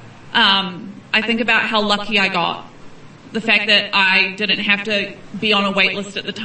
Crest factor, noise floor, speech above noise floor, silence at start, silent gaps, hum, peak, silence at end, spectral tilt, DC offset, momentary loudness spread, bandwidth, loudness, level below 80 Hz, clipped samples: 18 dB; -38 dBFS; 20 dB; 0 s; none; none; 0 dBFS; 0 s; -4 dB/octave; 0.1%; 12 LU; 8.8 kHz; -16 LUFS; -52 dBFS; under 0.1%